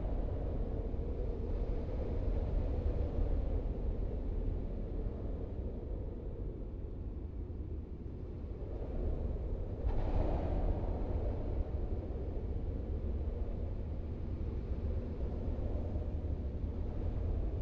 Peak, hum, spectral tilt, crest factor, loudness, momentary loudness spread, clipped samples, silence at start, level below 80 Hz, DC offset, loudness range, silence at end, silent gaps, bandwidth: -22 dBFS; none; -10 dB/octave; 14 dB; -40 LUFS; 7 LU; under 0.1%; 0 s; -38 dBFS; under 0.1%; 5 LU; 0 s; none; 4.7 kHz